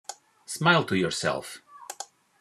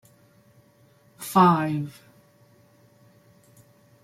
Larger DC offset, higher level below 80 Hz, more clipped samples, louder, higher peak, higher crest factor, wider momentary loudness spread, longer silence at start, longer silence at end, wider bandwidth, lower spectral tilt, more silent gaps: neither; about the same, -68 dBFS vs -70 dBFS; neither; second, -25 LUFS vs -21 LUFS; about the same, -4 dBFS vs -6 dBFS; about the same, 24 dB vs 22 dB; about the same, 21 LU vs 20 LU; second, 0.1 s vs 1.2 s; second, 0.35 s vs 2.15 s; second, 13.5 kHz vs 16 kHz; second, -4 dB/octave vs -6.5 dB/octave; neither